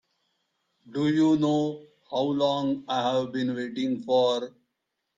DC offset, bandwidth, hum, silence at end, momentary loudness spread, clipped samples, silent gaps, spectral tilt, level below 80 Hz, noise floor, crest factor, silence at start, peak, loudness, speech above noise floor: under 0.1%; 7.6 kHz; none; 0.7 s; 10 LU; under 0.1%; none; -6.5 dB/octave; -70 dBFS; -81 dBFS; 16 dB; 0.85 s; -12 dBFS; -26 LUFS; 56 dB